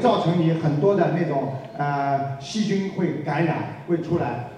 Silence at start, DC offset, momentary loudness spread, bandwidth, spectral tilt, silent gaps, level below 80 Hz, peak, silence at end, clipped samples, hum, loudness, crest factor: 0 s; under 0.1%; 7 LU; 9.6 kHz; -7.5 dB/octave; none; -60 dBFS; -6 dBFS; 0 s; under 0.1%; none; -23 LUFS; 16 dB